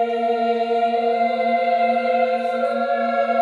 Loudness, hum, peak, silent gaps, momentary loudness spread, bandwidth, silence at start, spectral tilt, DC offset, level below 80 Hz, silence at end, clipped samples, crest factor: -20 LUFS; none; -8 dBFS; none; 2 LU; 7.2 kHz; 0 s; -5 dB/octave; under 0.1%; -82 dBFS; 0 s; under 0.1%; 12 dB